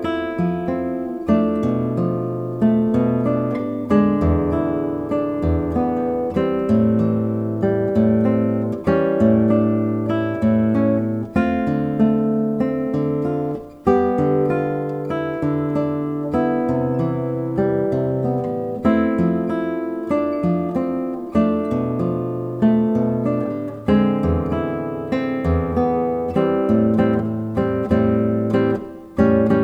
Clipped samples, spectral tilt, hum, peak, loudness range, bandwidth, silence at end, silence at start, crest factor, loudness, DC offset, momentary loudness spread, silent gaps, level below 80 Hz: under 0.1%; -10 dB/octave; none; -4 dBFS; 3 LU; 5.4 kHz; 0 s; 0 s; 16 dB; -20 LUFS; under 0.1%; 6 LU; none; -40 dBFS